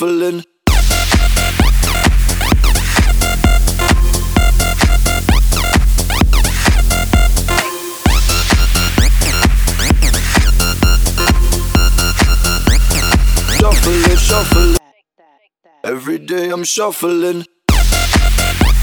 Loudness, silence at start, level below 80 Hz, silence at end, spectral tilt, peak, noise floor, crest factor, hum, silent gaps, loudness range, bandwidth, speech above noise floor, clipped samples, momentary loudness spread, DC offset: -13 LUFS; 0 s; -12 dBFS; 0 s; -4 dB/octave; 0 dBFS; -53 dBFS; 12 dB; none; none; 3 LU; over 20 kHz; 36 dB; under 0.1%; 4 LU; under 0.1%